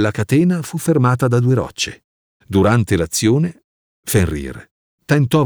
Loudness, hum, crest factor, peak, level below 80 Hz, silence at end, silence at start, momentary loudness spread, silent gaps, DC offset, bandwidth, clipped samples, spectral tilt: -17 LUFS; none; 14 dB; -2 dBFS; -40 dBFS; 0 s; 0 s; 9 LU; 2.04-2.40 s, 3.64-4.03 s, 4.71-4.98 s; under 0.1%; over 20 kHz; under 0.1%; -6 dB/octave